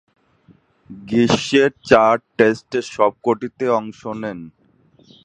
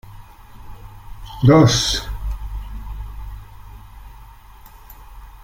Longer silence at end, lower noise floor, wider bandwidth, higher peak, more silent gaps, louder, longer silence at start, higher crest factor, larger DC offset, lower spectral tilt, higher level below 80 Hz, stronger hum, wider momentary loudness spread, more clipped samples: first, 0.75 s vs 0 s; first, -55 dBFS vs -42 dBFS; second, 9.8 kHz vs 16.5 kHz; about the same, 0 dBFS vs -2 dBFS; neither; about the same, -18 LUFS vs -16 LUFS; first, 0.9 s vs 0.05 s; about the same, 20 dB vs 20 dB; neither; about the same, -5 dB/octave vs -5.5 dB/octave; second, -54 dBFS vs -32 dBFS; neither; second, 15 LU vs 29 LU; neither